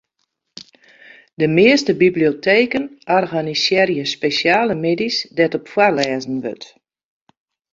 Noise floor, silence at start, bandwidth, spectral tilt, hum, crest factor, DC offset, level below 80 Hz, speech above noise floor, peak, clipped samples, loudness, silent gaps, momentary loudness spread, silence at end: -72 dBFS; 1.4 s; 7.6 kHz; -5 dB/octave; none; 16 dB; under 0.1%; -58 dBFS; 55 dB; -2 dBFS; under 0.1%; -16 LUFS; none; 9 LU; 1.1 s